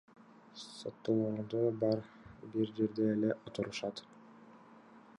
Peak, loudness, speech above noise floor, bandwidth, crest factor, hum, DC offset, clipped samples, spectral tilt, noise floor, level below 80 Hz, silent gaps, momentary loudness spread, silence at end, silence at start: -20 dBFS; -36 LUFS; 23 dB; 11 kHz; 18 dB; none; under 0.1%; under 0.1%; -7 dB/octave; -58 dBFS; -74 dBFS; none; 18 LU; 0.05 s; 0.55 s